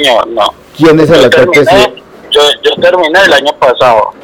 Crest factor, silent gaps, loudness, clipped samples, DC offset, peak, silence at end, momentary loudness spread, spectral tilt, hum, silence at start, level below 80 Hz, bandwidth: 6 dB; none; -6 LUFS; 4%; under 0.1%; 0 dBFS; 0.1 s; 7 LU; -4 dB/octave; none; 0 s; -38 dBFS; 17.5 kHz